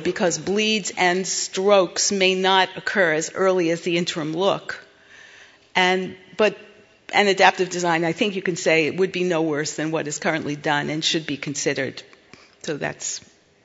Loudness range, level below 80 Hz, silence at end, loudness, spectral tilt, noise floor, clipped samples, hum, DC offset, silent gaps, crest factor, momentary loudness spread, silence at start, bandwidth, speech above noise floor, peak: 5 LU; -66 dBFS; 0.45 s; -21 LUFS; -3 dB/octave; -50 dBFS; under 0.1%; none; under 0.1%; none; 22 dB; 10 LU; 0 s; 8 kHz; 29 dB; 0 dBFS